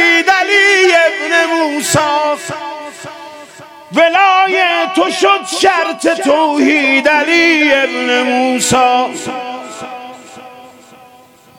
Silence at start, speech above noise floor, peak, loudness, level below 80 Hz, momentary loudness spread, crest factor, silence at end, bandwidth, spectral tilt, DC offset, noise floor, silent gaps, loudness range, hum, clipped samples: 0 s; 31 dB; 0 dBFS; -11 LUFS; -54 dBFS; 18 LU; 12 dB; 0.9 s; 17.5 kHz; -2.5 dB/octave; under 0.1%; -43 dBFS; none; 5 LU; none; under 0.1%